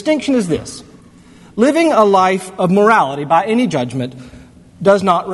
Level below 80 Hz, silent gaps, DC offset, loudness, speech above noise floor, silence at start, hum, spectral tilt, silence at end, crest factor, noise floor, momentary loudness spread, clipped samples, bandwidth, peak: -50 dBFS; none; under 0.1%; -14 LUFS; 28 dB; 0 s; none; -6 dB/octave; 0 s; 14 dB; -42 dBFS; 13 LU; under 0.1%; 12 kHz; 0 dBFS